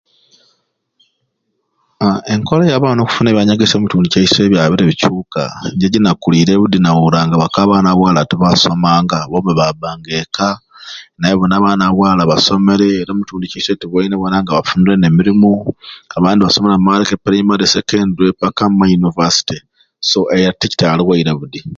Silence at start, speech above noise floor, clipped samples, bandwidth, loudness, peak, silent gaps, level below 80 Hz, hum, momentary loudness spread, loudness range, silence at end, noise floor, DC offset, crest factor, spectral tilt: 2 s; 56 dB; under 0.1%; 7.6 kHz; -12 LUFS; 0 dBFS; none; -42 dBFS; none; 9 LU; 3 LU; 0.05 s; -68 dBFS; under 0.1%; 12 dB; -5.5 dB/octave